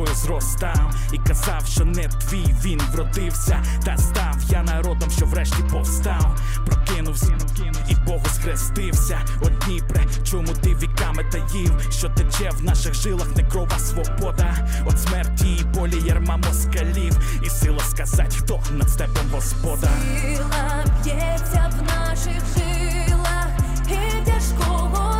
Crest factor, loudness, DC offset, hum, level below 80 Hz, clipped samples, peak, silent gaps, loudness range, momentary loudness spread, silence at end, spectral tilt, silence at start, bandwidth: 10 dB; -22 LUFS; under 0.1%; none; -20 dBFS; under 0.1%; -8 dBFS; none; 1 LU; 3 LU; 0 s; -5 dB/octave; 0 s; 16.5 kHz